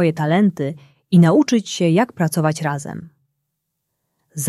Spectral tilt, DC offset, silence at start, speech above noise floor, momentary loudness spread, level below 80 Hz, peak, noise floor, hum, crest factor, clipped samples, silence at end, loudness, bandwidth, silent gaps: -6 dB/octave; under 0.1%; 0 s; 59 dB; 15 LU; -62 dBFS; -2 dBFS; -76 dBFS; none; 16 dB; under 0.1%; 0 s; -17 LUFS; 13.5 kHz; none